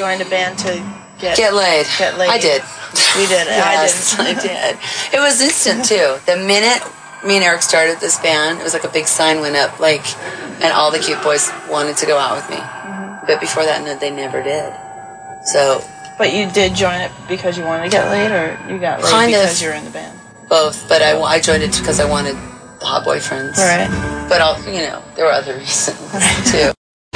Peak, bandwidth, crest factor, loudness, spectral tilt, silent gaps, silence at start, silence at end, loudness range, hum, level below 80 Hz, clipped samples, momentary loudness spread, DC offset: 0 dBFS; 10.5 kHz; 16 dB; -14 LUFS; -2 dB/octave; none; 0 s; 0.4 s; 5 LU; none; -42 dBFS; under 0.1%; 12 LU; under 0.1%